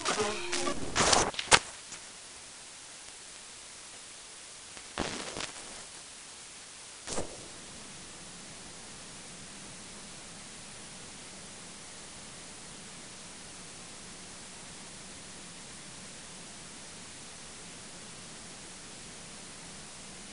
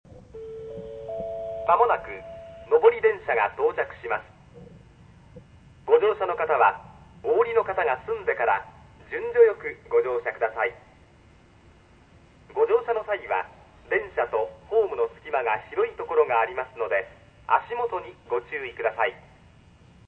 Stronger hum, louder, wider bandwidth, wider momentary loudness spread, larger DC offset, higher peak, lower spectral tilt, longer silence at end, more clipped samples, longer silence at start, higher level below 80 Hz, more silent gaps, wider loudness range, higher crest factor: neither; second, -37 LUFS vs -25 LUFS; first, 11 kHz vs 4.1 kHz; second, 13 LU vs 17 LU; first, 0.1% vs under 0.1%; about the same, -2 dBFS vs -4 dBFS; second, -1.5 dB/octave vs -6.5 dB/octave; second, 0 s vs 0.9 s; neither; about the same, 0 s vs 0.1 s; about the same, -58 dBFS vs -58 dBFS; neither; first, 15 LU vs 5 LU; first, 38 dB vs 22 dB